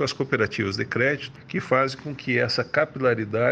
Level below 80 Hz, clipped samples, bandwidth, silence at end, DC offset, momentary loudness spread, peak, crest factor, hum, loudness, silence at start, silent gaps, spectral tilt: -60 dBFS; under 0.1%; 9.4 kHz; 0 s; under 0.1%; 8 LU; -6 dBFS; 18 dB; none; -24 LUFS; 0 s; none; -5.5 dB/octave